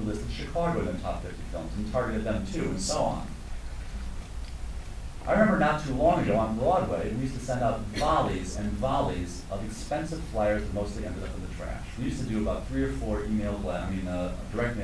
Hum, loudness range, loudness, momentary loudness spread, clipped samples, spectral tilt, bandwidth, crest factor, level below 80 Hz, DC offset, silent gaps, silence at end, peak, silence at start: none; 6 LU; -30 LUFS; 14 LU; under 0.1%; -6 dB/octave; 11 kHz; 20 dB; -38 dBFS; under 0.1%; none; 0 s; -10 dBFS; 0 s